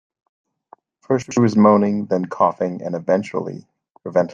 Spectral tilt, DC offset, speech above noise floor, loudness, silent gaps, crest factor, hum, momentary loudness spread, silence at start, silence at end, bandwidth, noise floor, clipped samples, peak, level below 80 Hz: -7.5 dB/octave; under 0.1%; 33 dB; -19 LUFS; 3.91-3.95 s; 18 dB; none; 13 LU; 1.1 s; 0 s; 7.6 kHz; -51 dBFS; under 0.1%; -2 dBFS; -66 dBFS